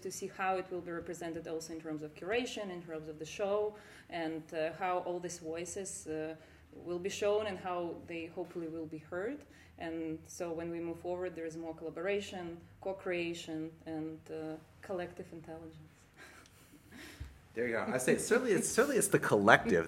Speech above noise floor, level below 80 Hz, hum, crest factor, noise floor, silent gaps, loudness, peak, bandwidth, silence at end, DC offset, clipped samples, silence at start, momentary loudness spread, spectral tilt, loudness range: 23 dB; -66 dBFS; none; 30 dB; -60 dBFS; none; -36 LUFS; -6 dBFS; 16 kHz; 0 s; under 0.1%; under 0.1%; 0 s; 19 LU; -4 dB/octave; 9 LU